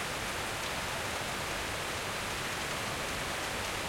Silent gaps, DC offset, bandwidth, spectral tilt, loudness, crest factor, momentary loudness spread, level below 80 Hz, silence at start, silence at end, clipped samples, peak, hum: none; under 0.1%; 16.5 kHz; -2.5 dB/octave; -34 LUFS; 12 dB; 0 LU; -52 dBFS; 0 s; 0 s; under 0.1%; -22 dBFS; none